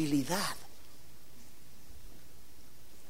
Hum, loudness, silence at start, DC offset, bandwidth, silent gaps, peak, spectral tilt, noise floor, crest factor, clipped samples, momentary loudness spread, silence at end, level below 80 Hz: none; -34 LUFS; 0 s; 1%; 16 kHz; none; -18 dBFS; -4 dB/octave; -58 dBFS; 20 dB; under 0.1%; 25 LU; 0 s; -60 dBFS